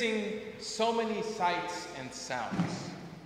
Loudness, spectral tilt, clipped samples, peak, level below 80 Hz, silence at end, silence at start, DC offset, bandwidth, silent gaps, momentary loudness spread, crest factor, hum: -34 LUFS; -4.5 dB/octave; under 0.1%; -16 dBFS; -66 dBFS; 0 s; 0 s; under 0.1%; 15.5 kHz; none; 10 LU; 18 dB; none